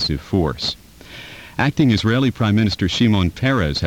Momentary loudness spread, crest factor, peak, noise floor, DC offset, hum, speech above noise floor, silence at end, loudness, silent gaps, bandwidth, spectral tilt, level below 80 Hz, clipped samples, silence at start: 18 LU; 16 dB; -2 dBFS; -38 dBFS; 0.2%; none; 21 dB; 0 s; -18 LUFS; none; 16.5 kHz; -6 dB/octave; -36 dBFS; under 0.1%; 0 s